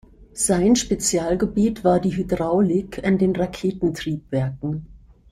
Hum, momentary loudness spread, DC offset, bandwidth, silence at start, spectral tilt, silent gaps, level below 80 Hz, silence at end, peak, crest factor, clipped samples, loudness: none; 8 LU; under 0.1%; 15 kHz; 0.2 s; -5.5 dB/octave; none; -44 dBFS; 0.35 s; -6 dBFS; 16 dB; under 0.1%; -21 LUFS